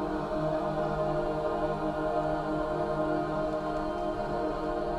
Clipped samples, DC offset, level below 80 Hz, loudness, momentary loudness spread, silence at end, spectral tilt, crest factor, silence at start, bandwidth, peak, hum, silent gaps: under 0.1%; under 0.1%; -44 dBFS; -31 LUFS; 2 LU; 0 s; -7.5 dB/octave; 12 dB; 0 s; 11.5 kHz; -18 dBFS; none; none